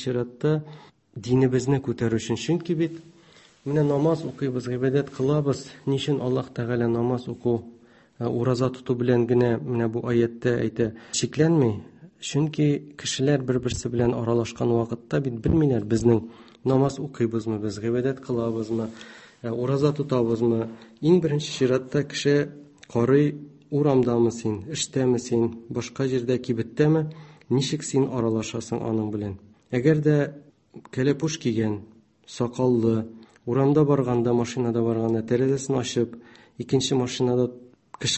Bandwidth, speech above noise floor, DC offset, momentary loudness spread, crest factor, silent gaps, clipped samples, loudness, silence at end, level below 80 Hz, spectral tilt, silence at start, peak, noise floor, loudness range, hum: 8.6 kHz; 30 dB; under 0.1%; 9 LU; 18 dB; none; under 0.1%; -24 LUFS; 0 s; -52 dBFS; -6.5 dB/octave; 0 s; -6 dBFS; -54 dBFS; 3 LU; none